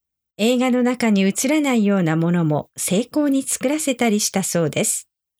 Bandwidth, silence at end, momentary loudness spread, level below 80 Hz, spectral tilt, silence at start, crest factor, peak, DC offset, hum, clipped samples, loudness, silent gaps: over 20 kHz; 0.35 s; 4 LU; -64 dBFS; -4.5 dB/octave; 0.4 s; 12 dB; -6 dBFS; under 0.1%; none; under 0.1%; -19 LUFS; none